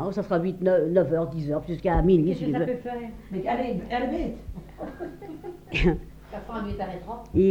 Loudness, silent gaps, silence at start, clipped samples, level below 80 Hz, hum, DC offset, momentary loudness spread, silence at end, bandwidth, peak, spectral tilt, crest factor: -26 LUFS; none; 0 s; under 0.1%; -38 dBFS; none; under 0.1%; 18 LU; 0 s; 15.5 kHz; -8 dBFS; -8.5 dB/octave; 18 dB